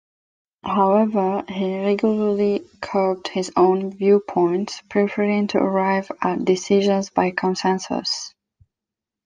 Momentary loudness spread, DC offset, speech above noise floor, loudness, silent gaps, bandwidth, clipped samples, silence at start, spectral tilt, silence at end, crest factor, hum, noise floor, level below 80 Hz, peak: 7 LU; under 0.1%; 67 dB; -20 LUFS; none; 9.6 kHz; under 0.1%; 0.65 s; -5.5 dB/octave; 0.95 s; 18 dB; none; -87 dBFS; -64 dBFS; -2 dBFS